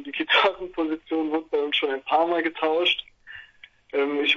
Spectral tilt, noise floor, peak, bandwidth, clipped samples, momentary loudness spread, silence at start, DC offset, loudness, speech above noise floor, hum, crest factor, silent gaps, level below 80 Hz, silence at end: -3.5 dB/octave; -52 dBFS; -6 dBFS; 7.2 kHz; under 0.1%; 14 LU; 0 s; under 0.1%; -24 LUFS; 29 dB; none; 20 dB; none; -62 dBFS; 0 s